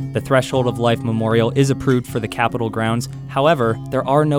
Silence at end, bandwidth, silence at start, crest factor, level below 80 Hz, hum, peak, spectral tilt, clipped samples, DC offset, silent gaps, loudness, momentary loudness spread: 0 s; 16.5 kHz; 0 s; 16 dB; -46 dBFS; none; -2 dBFS; -6.5 dB/octave; under 0.1%; under 0.1%; none; -18 LUFS; 5 LU